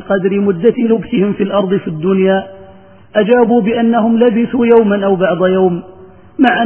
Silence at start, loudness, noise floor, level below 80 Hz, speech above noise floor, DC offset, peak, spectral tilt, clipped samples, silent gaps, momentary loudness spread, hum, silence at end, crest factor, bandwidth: 0 s; -12 LUFS; -39 dBFS; -48 dBFS; 28 dB; 0.4%; 0 dBFS; -11 dB/octave; under 0.1%; none; 6 LU; none; 0 s; 12 dB; 3.7 kHz